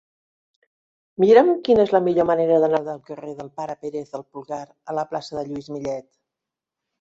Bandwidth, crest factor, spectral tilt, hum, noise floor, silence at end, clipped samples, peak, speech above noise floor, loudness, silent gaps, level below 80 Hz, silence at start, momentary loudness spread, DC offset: 7.6 kHz; 20 dB; -7 dB/octave; none; -86 dBFS; 1 s; under 0.1%; -2 dBFS; 66 dB; -20 LUFS; none; -60 dBFS; 1.2 s; 19 LU; under 0.1%